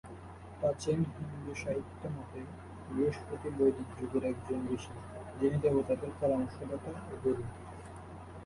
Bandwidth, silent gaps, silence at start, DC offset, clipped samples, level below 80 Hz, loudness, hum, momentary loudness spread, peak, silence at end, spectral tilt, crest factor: 11.5 kHz; none; 0.05 s; under 0.1%; under 0.1%; -54 dBFS; -35 LUFS; none; 17 LU; -18 dBFS; 0 s; -7.5 dB/octave; 18 dB